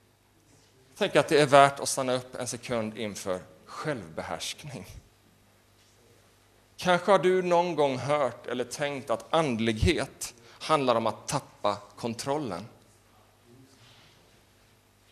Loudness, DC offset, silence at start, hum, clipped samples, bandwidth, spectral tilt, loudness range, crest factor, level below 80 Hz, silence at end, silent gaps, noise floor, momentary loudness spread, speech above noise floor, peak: -27 LUFS; under 0.1%; 0.95 s; 50 Hz at -60 dBFS; under 0.1%; 13.5 kHz; -4.5 dB/octave; 12 LU; 26 dB; -52 dBFS; 2.45 s; none; -63 dBFS; 14 LU; 36 dB; -2 dBFS